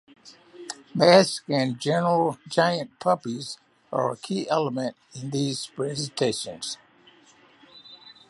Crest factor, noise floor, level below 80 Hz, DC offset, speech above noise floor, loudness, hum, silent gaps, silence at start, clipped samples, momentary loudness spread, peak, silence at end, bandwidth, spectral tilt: 24 dB; -56 dBFS; -70 dBFS; under 0.1%; 32 dB; -25 LUFS; none; none; 0.25 s; under 0.1%; 19 LU; -2 dBFS; 0.2 s; 11.5 kHz; -4.5 dB/octave